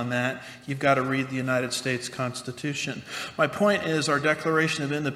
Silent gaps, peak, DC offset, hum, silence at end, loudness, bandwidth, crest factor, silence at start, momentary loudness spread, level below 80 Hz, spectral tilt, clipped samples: none; -8 dBFS; under 0.1%; none; 0 s; -26 LUFS; 15 kHz; 20 dB; 0 s; 9 LU; -66 dBFS; -4.5 dB/octave; under 0.1%